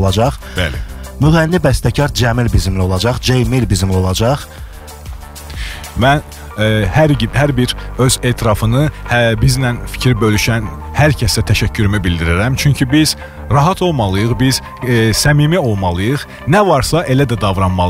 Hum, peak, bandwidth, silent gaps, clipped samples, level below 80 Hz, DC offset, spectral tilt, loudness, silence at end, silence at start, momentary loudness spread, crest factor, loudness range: none; -2 dBFS; 16 kHz; none; under 0.1%; -26 dBFS; 0.2%; -5.5 dB/octave; -13 LUFS; 0 s; 0 s; 9 LU; 12 dB; 3 LU